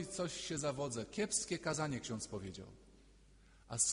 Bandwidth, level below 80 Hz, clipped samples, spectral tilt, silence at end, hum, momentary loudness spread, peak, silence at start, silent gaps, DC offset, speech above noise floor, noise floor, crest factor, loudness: 11 kHz; -64 dBFS; under 0.1%; -3 dB/octave; 0 s; none; 11 LU; -18 dBFS; 0 s; none; under 0.1%; 23 dB; -64 dBFS; 22 dB; -40 LUFS